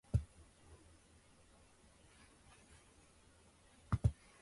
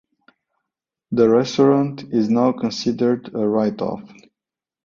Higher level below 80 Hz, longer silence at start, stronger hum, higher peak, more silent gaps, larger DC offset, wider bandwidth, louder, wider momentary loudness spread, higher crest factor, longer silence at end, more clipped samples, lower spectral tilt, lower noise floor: first, -52 dBFS vs -60 dBFS; second, 0.15 s vs 1.1 s; neither; second, -22 dBFS vs -4 dBFS; neither; neither; first, 11.5 kHz vs 7.4 kHz; second, -40 LUFS vs -19 LUFS; first, 28 LU vs 9 LU; first, 24 dB vs 18 dB; second, 0.3 s vs 0.8 s; neither; about the same, -7.5 dB/octave vs -6.5 dB/octave; second, -67 dBFS vs -89 dBFS